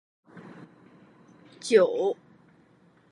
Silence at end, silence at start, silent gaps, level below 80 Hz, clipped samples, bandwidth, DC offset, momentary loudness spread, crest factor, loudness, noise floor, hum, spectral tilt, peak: 1 s; 0.35 s; none; -82 dBFS; under 0.1%; 11 kHz; under 0.1%; 26 LU; 22 dB; -24 LUFS; -60 dBFS; none; -4.5 dB/octave; -6 dBFS